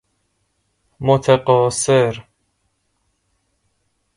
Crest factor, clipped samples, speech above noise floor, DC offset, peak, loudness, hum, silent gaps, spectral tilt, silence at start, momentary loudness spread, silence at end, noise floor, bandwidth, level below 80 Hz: 20 dB; under 0.1%; 53 dB; under 0.1%; 0 dBFS; -16 LUFS; none; none; -5 dB/octave; 1 s; 9 LU; 1.95 s; -68 dBFS; 11.5 kHz; -54 dBFS